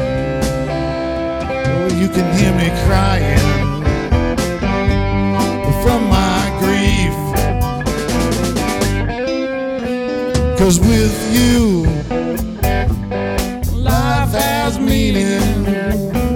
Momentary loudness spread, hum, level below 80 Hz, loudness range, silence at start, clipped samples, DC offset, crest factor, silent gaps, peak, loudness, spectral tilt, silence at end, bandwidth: 6 LU; none; -22 dBFS; 2 LU; 0 s; under 0.1%; under 0.1%; 14 dB; none; 0 dBFS; -16 LUFS; -5.5 dB/octave; 0 s; 17.5 kHz